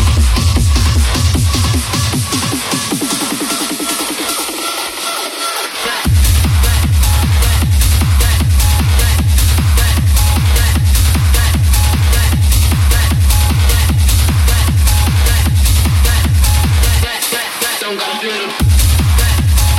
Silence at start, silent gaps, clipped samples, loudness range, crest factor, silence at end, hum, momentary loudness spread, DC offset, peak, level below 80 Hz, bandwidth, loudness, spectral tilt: 0 s; none; under 0.1%; 4 LU; 10 dB; 0 s; none; 5 LU; under 0.1%; 0 dBFS; -14 dBFS; 16.5 kHz; -12 LUFS; -4 dB/octave